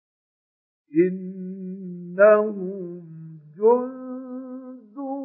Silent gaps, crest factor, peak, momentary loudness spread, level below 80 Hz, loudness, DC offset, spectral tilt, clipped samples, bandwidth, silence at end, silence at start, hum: none; 20 dB; -4 dBFS; 23 LU; under -90 dBFS; -21 LUFS; under 0.1%; -13 dB/octave; under 0.1%; 2.9 kHz; 0 s; 0.9 s; none